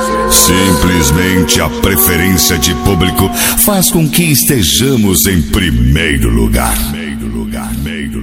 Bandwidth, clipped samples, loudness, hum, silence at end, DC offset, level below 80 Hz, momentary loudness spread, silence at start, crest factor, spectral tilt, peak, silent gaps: over 20 kHz; 0.6%; -10 LUFS; none; 0 s; under 0.1%; -20 dBFS; 11 LU; 0 s; 10 dB; -3.5 dB/octave; 0 dBFS; none